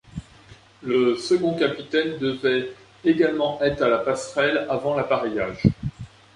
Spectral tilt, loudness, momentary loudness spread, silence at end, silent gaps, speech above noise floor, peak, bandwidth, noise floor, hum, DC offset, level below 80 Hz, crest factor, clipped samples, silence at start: -6 dB/octave; -23 LUFS; 13 LU; 0.3 s; none; 27 dB; -2 dBFS; 11 kHz; -49 dBFS; none; under 0.1%; -46 dBFS; 20 dB; under 0.1%; 0.15 s